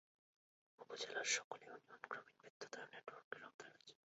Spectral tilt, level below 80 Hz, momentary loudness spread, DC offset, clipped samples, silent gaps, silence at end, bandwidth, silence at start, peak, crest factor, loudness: 1.5 dB/octave; under -90 dBFS; 19 LU; under 0.1%; under 0.1%; 1.44-1.51 s, 2.50-2.60 s, 3.24-3.31 s, 3.54-3.59 s; 0.2 s; 7.6 kHz; 0.8 s; -24 dBFS; 28 dB; -48 LUFS